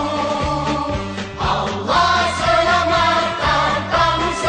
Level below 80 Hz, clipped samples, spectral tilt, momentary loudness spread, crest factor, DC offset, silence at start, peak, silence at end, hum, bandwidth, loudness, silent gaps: -36 dBFS; under 0.1%; -4 dB/octave; 7 LU; 14 dB; under 0.1%; 0 s; -4 dBFS; 0 s; none; 10 kHz; -17 LUFS; none